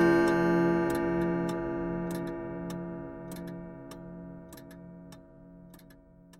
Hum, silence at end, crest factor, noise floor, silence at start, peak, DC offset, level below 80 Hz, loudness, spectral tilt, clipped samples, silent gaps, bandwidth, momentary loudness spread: none; 0.05 s; 18 dB; -55 dBFS; 0 s; -12 dBFS; under 0.1%; -54 dBFS; -30 LUFS; -7 dB/octave; under 0.1%; none; 14.5 kHz; 24 LU